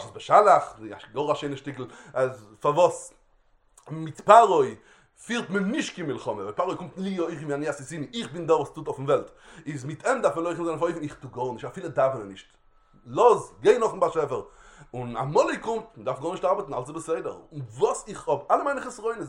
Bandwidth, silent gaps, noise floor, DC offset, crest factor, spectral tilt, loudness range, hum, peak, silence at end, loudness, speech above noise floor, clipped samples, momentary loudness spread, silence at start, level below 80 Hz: 11.5 kHz; none; -62 dBFS; under 0.1%; 24 dB; -5.5 dB/octave; 6 LU; none; -2 dBFS; 0 s; -25 LUFS; 37 dB; under 0.1%; 16 LU; 0 s; -60 dBFS